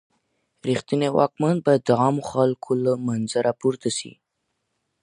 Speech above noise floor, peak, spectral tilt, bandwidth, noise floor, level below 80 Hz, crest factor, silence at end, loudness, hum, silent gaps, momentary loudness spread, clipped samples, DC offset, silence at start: 55 dB; -4 dBFS; -6 dB/octave; 11.5 kHz; -76 dBFS; -64 dBFS; 20 dB; 0.9 s; -22 LUFS; none; none; 7 LU; under 0.1%; under 0.1%; 0.65 s